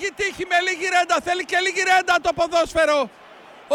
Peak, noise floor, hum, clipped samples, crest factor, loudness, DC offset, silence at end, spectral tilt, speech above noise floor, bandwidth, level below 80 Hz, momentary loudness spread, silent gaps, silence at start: -4 dBFS; -44 dBFS; none; under 0.1%; 16 dB; -20 LUFS; under 0.1%; 0 s; -2 dB/octave; 24 dB; 14.5 kHz; -52 dBFS; 6 LU; none; 0 s